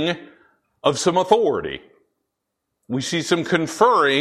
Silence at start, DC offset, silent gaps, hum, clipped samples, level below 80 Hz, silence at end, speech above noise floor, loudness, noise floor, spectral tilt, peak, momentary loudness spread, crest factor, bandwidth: 0 s; under 0.1%; none; none; under 0.1%; -58 dBFS; 0 s; 60 dB; -20 LUFS; -79 dBFS; -4 dB/octave; -2 dBFS; 13 LU; 20 dB; 13.5 kHz